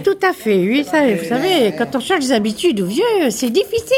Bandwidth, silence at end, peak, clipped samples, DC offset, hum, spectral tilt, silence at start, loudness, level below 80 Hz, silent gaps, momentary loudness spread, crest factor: 17 kHz; 0 s; -4 dBFS; under 0.1%; under 0.1%; none; -4.5 dB/octave; 0 s; -16 LUFS; -54 dBFS; none; 2 LU; 12 dB